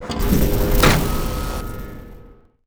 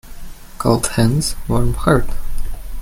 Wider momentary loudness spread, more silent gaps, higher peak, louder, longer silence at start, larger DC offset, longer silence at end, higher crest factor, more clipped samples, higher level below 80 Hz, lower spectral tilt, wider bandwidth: first, 19 LU vs 15 LU; neither; about the same, -2 dBFS vs 0 dBFS; about the same, -19 LUFS vs -17 LUFS; about the same, 0 s vs 0.05 s; neither; first, 0.35 s vs 0 s; about the same, 18 dB vs 16 dB; neither; about the same, -22 dBFS vs -24 dBFS; about the same, -5 dB/octave vs -5.5 dB/octave; first, over 20 kHz vs 16 kHz